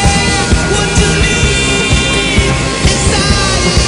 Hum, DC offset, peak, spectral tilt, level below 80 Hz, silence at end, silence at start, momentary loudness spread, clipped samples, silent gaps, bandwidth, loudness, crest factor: none; under 0.1%; 0 dBFS; -3.5 dB/octave; -18 dBFS; 0 s; 0 s; 1 LU; under 0.1%; none; 11 kHz; -10 LUFS; 10 dB